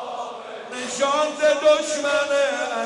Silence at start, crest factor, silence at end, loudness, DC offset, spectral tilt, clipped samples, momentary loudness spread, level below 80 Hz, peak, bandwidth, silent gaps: 0 s; 14 dB; 0 s; -21 LUFS; under 0.1%; -1 dB/octave; under 0.1%; 14 LU; -66 dBFS; -8 dBFS; 11 kHz; none